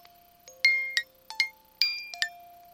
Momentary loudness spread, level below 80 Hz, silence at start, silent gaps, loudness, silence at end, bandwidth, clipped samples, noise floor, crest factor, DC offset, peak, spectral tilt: 9 LU; -74 dBFS; 0.45 s; none; -27 LUFS; 0.2 s; 16.5 kHz; under 0.1%; -55 dBFS; 26 dB; under 0.1%; -6 dBFS; 3 dB/octave